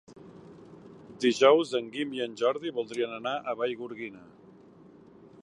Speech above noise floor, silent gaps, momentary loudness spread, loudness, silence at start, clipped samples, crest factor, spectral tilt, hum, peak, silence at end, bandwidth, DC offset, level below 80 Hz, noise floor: 26 dB; none; 24 LU; -28 LUFS; 0.1 s; under 0.1%; 24 dB; -4 dB/octave; none; -6 dBFS; 1.2 s; 11.5 kHz; under 0.1%; -74 dBFS; -54 dBFS